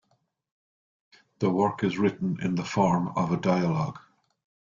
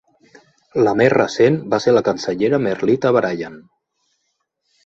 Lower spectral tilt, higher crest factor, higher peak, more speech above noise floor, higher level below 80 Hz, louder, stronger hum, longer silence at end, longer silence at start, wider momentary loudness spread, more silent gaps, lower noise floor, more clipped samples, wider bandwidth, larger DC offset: first, -7.5 dB/octave vs -6 dB/octave; about the same, 18 dB vs 18 dB; second, -10 dBFS vs -2 dBFS; second, 47 dB vs 55 dB; second, -62 dBFS vs -56 dBFS; second, -27 LUFS vs -17 LUFS; neither; second, 0.7 s vs 1.25 s; first, 1.4 s vs 0.75 s; second, 5 LU vs 9 LU; neither; about the same, -72 dBFS vs -71 dBFS; neither; about the same, 7.4 kHz vs 8 kHz; neither